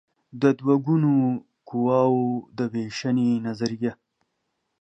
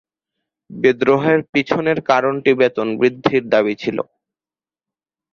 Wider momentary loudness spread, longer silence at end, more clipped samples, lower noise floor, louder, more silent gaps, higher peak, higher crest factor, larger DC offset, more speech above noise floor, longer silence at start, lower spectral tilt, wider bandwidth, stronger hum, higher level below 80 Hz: about the same, 9 LU vs 7 LU; second, 0.9 s vs 1.3 s; neither; second, -77 dBFS vs under -90 dBFS; second, -24 LUFS vs -17 LUFS; second, none vs 1.49-1.53 s; second, -6 dBFS vs 0 dBFS; about the same, 18 dB vs 18 dB; neither; second, 54 dB vs over 74 dB; second, 0.35 s vs 0.7 s; about the same, -7.5 dB/octave vs -6.5 dB/octave; first, 8 kHz vs 6.8 kHz; neither; second, -70 dBFS vs -58 dBFS